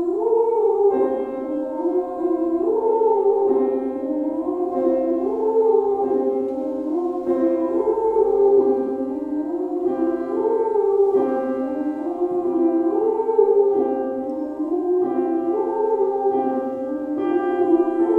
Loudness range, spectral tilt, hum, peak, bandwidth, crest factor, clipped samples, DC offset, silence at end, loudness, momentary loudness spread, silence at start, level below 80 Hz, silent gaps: 2 LU; -8.5 dB/octave; none; -4 dBFS; 3.4 kHz; 16 dB; under 0.1%; under 0.1%; 0 s; -21 LUFS; 7 LU; 0 s; -60 dBFS; none